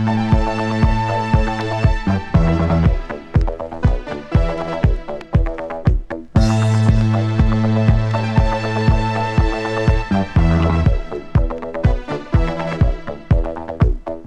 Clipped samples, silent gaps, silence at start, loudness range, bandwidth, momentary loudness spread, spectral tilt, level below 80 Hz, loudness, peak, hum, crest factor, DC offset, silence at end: under 0.1%; none; 0 s; 3 LU; 9.2 kHz; 6 LU; -8 dB/octave; -22 dBFS; -18 LUFS; -2 dBFS; none; 14 dB; under 0.1%; 0 s